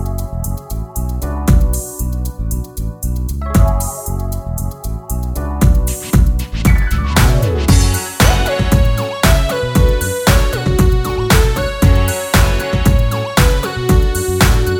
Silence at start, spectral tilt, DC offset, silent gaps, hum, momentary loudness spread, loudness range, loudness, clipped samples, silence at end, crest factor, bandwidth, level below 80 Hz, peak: 0 s; -5 dB/octave; under 0.1%; none; none; 10 LU; 6 LU; -15 LUFS; under 0.1%; 0 s; 14 dB; 19.5 kHz; -16 dBFS; 0 dBFS